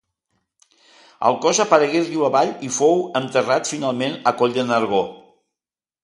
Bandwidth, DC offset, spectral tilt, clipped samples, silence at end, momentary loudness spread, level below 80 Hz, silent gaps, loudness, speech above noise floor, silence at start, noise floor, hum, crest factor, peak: 11.5 kHz; under 0.1%; -3.5 dB/octave; under 0.1%; 0.85 s; 6 LU; -66 dBFS; none; -19 LUFS; over 71 dB; 1.2 s; under -90 dBFS; none; 20 dB; 0 dBFS